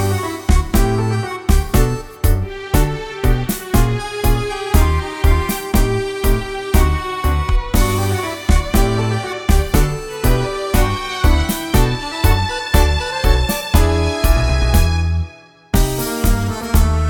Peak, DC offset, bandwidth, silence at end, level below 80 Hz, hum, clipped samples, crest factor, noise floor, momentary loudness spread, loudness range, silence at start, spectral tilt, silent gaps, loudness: 0 dBFS; under 0.1%; over 20 kHz; 0 s; -18 dBFS; none; under 0.1%; 16 dB; -36 dBFS; 5 LU; 2 LU; 0 s; -5.5 dB/octave; none; -18 LUFS